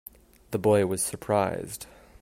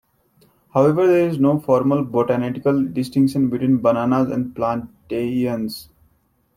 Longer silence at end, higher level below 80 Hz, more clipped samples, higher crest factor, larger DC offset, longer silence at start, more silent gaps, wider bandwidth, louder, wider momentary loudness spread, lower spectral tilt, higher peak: second, 0.35 s vs 0.75 s; about the same, -58 dBFS vs -56 dBFS; neither; about the same, 18 dB vs 16 dB; neither; second, 0.5 s vs 0.75 s; neither; about the same, 16 kHz vs 15.5 kHz; second, -26 LUFS vs -19 LUFS; first, 16 LU vs 9 LU; second, -5 dB/octave vs -8 dB/octave; second, -10 dBFS vs -2 dBFS